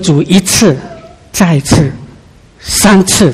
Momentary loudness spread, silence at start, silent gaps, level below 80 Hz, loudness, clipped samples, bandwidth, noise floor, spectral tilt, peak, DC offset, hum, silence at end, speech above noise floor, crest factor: 18 LU; 0 s; none; -32 dBFS; -9 LUFS; 1%; 15.5 kHz; -38 dBFS; -4.5 dB/octave; 0 dBFS; under 0.1%; none; 0 s; 30 dB; 10 dB